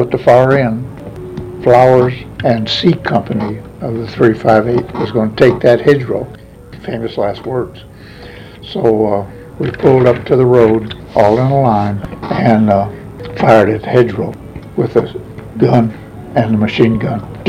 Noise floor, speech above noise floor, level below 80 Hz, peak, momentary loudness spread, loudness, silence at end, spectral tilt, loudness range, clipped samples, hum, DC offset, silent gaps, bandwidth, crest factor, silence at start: -33 dBFS; 22 dB; -40 dBFS; 0 dBFS; 18 LU; -12 LUFS; 0 s; -8 dB/octave; 5 LU; 0.3%; none; under 0.1%; none; 14 kHz; 12 dB; 0 s